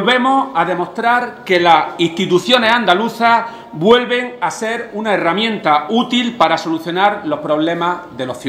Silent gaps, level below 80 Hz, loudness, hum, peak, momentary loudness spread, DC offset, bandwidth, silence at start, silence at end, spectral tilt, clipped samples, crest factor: none; -58 dBFS; -15 LUFS; none; 0 dBFS; 8 LU; under 0.1%; 16 kHz; 0 s; 0 s; -4.5 dB/octave; under 0.1%; 14 dB